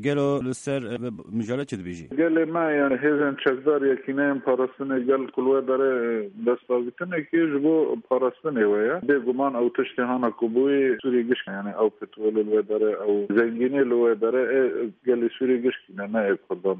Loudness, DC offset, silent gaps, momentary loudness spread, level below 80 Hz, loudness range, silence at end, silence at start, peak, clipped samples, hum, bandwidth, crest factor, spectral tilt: -24 LUFS; under 0.1%; none; 7 LU; -68 dBFS; 1 LU; 0 s; 0 s; -8 dBFS; under 0.1%; none; 10 kHz; 16 dB; -7 dB/octave